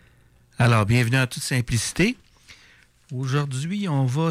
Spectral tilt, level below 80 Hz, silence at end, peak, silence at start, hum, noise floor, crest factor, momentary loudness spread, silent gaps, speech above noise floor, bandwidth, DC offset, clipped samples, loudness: -5.5 dB/octave; -46 dBFS; 0 s; -10 dBFS; 0.6 s; none; -56 dBFS; 12 dB; 8 LU; none; 34 dB; 15 kHz; under 0.1%; under 0.1%; -22 LUFS